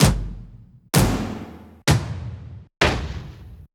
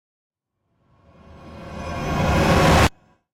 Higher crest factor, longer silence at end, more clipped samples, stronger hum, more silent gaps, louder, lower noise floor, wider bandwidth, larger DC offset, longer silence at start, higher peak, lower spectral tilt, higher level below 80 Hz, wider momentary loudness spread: first, 22 dB vs 16 dB; second, 0.1 s vs 0.45 s; neither; neither; neither; second, -22 LUFS vs -19 LUFS; second, -45 dBFS vs -72 dBFS; first, over 20 kHz vs 16 kHz; neither; second, 0 s vs 1.45 s; first, -2 dBFS vs -6 dBFS; about the same, -4.5 dB/octave vs -5.5 dB/octave; about the same, -32 dBFS vs -32 dBFS; about the same, 21 LU vs 20 LU